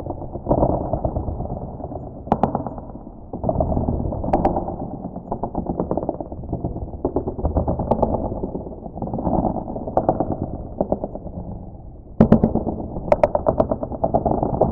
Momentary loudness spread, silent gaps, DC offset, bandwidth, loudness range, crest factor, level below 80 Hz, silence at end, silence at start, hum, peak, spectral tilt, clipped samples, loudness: 13 LU; none; under 0.1%; 5.6 kHz; 4 LU; 22 dB; -34 dBFS; 0 s; 0 s; none; 0 dBFS; -11.5 dB/octave; under 0.1%; -23 LUFS